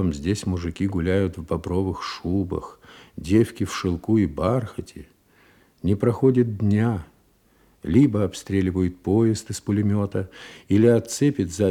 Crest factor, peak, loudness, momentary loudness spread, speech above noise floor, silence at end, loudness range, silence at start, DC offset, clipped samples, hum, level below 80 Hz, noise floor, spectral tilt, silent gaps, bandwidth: 18 dB; -6 dBFS; -23 LUFS; 12 LU; 38 dB; 0 s; 3 LU; 0 s; under 0.1%; under 0.1%; none; -48 dBFS; -60 dBFS; -7 dB/octave; none; 15 kHz